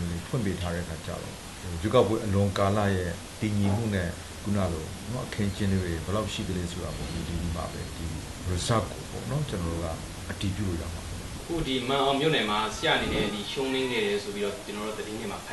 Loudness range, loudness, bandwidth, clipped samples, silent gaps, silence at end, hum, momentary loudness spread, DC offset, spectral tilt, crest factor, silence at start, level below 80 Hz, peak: 5 LU; -29 LUFS; 12.5 kHz; under 0.1%; none; 0 s; none; 11 LU; under 0.1%; -5 dB/octave; 22 dB; 0 s; -44 dBFS; -8 dBFS